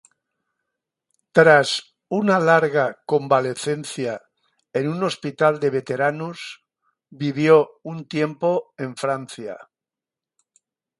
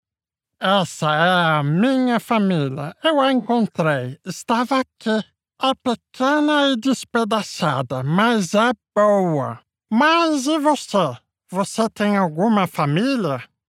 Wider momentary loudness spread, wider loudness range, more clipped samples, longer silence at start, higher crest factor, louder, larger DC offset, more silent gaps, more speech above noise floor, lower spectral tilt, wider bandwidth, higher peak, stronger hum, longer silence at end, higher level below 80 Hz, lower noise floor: first, 16 LU vs 8 LU; first, 6 LU vs 2 LU; neither; first, 1.35 s vs 0.6 s; about the same, 22 dB vs 18 dB; about the same, -20 LUFS vs -19 LUFS; neither; neither; about the same, 69 dB vs 70 dB; about the same, -5.5 dB/octave vs -5.5 dB/octave; second, 11.5 kHz vs 15.5 kHz; about the same, 0 dBFS vs -2 dBFS; neither; first, 1.4 s vs 0.25 s; about the same, -68 dBFS vs -68 dBFS; about the same, -89 dBFS vs -89 dBFS